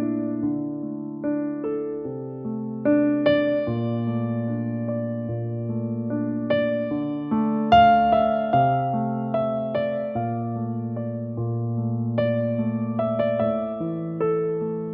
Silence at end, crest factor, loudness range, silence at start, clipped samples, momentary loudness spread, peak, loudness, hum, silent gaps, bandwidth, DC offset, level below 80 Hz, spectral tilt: 0 s; 18 dB; 6 LU; 0 s; under 0.1%; 9 LU; -4 dBFS; -24 LUFS; none; none; 5.4 kHz; under 0.1%; -54 dBFS; -6.5 dB/octave